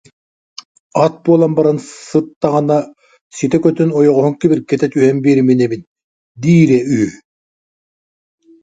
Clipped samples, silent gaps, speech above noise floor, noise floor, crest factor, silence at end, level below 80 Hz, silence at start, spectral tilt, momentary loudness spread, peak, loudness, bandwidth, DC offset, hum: under 0.1%; 2.36-2.41 s, 3.21-3.31 s, 5.87-5.96 s, 6.04-6.35 s; over 78 dB; under -90 dBFS; 14 dB; 1.45 s; -54 dBFS; 0.95 s; -7.5 dB/octave; 10 LU; 0 dBFS; -13 LUFS; 9.2 kHz; under 0.1%; none